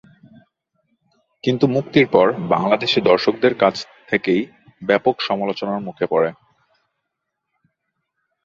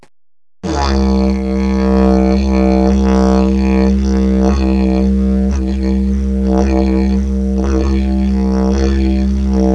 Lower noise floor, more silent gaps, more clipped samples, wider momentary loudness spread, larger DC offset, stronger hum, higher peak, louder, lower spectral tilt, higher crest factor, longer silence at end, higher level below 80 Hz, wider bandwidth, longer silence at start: second, -78 dBFS vs under -90 dBFS; neither; neither; first, 9 LU vs 4 LU; second, under 0.1% vs 0.8%; neither; about the same, 0 dBFS vs 0 dBFS; second, -18 LUFS vs -13 LUFS; second, -6.5 dB/octave vs -8 dB/octave; first, 20 dB vs 12 dB; first, 2.1 s vs 0 s; second, -60 dBFS vs -18 dBFS; about the same, 7.4 kHz vs 7.6 kHz; first, 1.45 s vs 0.65 s